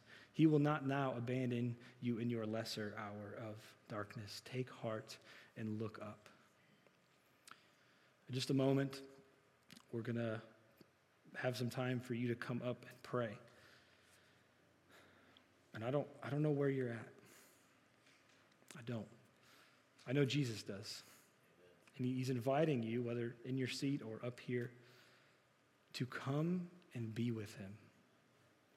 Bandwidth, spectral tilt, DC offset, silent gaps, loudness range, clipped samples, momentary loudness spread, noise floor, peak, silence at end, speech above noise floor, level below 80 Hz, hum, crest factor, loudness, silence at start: 15 kHz; -6.5 dB/octave; under 0.1%; none; 8 LU; under 0.1%; 20 LU; -74 dBFS; -22 dBFS; 0.9 s; 33 dB; under -90 dBFS; none; 22 dB; -42 LUFS; 0.1 s